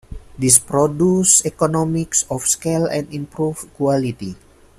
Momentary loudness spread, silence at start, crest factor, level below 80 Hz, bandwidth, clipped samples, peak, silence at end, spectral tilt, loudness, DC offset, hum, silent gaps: 12 LU; 0.1 s; 18 dB; -44 dBFS; 15.5 kHz; under 0.1%; 0 dBFS; 0.45 s; -4.5 dB/octave; -17 LUFS; under 0.1%; none; none